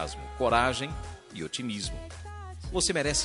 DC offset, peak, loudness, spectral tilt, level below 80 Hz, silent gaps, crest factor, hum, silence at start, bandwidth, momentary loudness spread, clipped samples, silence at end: under 0.1%; -8 dBFS; -29 LUFS; -3 dB/octave; -44 dBFS; none; 22 dB; none; 0 s; 11.5 kHz; 17 LU; under 0.1%; 0 s